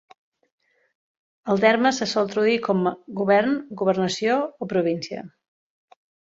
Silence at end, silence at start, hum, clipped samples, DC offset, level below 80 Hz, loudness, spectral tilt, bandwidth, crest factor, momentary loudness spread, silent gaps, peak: 1 s; 1.45 s; none; under 0.1%; under 0.1%; -68 dBFS; -22 LUFS; -5 dB/octave; 7.8 kHz; 20 dB; 9 LU; none; -4 dBFS